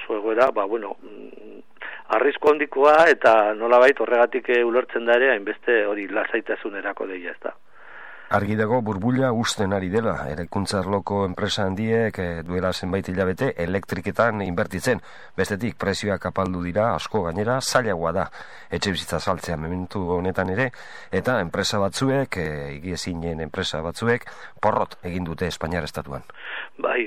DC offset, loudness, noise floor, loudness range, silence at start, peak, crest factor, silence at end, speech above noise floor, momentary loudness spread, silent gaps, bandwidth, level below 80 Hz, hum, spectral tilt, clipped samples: 0.7%; -23 LUFS; -44 dBFS; 8 LU; 0 s; -6 dBFS; 18 dB; 0 s; 21 dB; 13 LU; none; 15.5 kHz; -50 dBFS; none; -5 dB/octave; under 0.1%